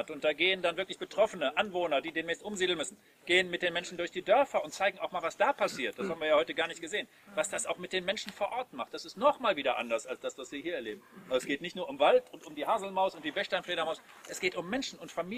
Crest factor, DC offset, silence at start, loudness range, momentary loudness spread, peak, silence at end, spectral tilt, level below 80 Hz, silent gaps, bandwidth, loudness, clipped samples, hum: 22 dB; under 0.1%; 0 s; 3 LU; 12 LU; -10 dBFS; 0 s; -3 dB/octave; -72 dBFS; none; 15.5 kHz; -32 LUFS; under 0.1%; none